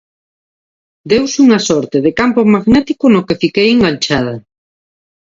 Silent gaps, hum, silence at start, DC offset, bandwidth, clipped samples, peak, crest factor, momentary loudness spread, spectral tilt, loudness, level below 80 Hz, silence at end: none; none; 1.05 s; under 0.1%; 7.8 kHz; under 0.1%; 0 dBFS; 12 dB; 5 LU; -5 dB/octave; -11 LUFS; -42 dBFS; 0.85 s